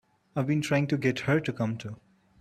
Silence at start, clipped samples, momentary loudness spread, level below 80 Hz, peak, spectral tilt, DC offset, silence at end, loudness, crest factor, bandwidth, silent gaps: 0.35 s; under 0.1%; 13 LU; -64 dBFS; -12 dBFS; -6.5 dB/octave; under 0.1%; 0.45 s; -28 LUFS; 18 dB; 13.5 kHz; none